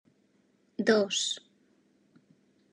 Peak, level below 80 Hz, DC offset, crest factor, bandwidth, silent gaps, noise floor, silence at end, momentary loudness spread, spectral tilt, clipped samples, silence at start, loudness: -10 dBFS; under -90 dBFS; under 0.1%; 24 dB; 10.5 kHz; none; -69 dBFS; 1.35 s; 14 LU; -2.5 dB/octave; under 0.1%; 0.8 s; -28 LUFS